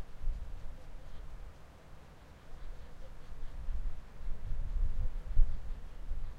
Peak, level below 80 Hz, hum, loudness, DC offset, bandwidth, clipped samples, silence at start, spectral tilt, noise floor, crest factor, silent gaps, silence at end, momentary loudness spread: -12 dBFS; -36 dBFS; none; -45 LUFS; under 0.1%; 3.8 kHz; under 0.1%; 0 s; -7 dB/octave; -53 dBFS; 20 dB; none; 0 s; 17 LU